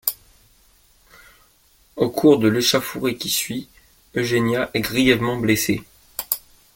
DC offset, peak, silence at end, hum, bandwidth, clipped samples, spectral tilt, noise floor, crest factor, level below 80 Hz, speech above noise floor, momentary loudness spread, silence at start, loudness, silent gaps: under 0.1%; 0 dBFS; 0.4 s; none; 17 kHz; under 0.1%; -4 dB/octave; -57 dBFS; 22 dB; -50 dBFS; 38 dB; 14 LU; 0.05 s; -20 LUFS; none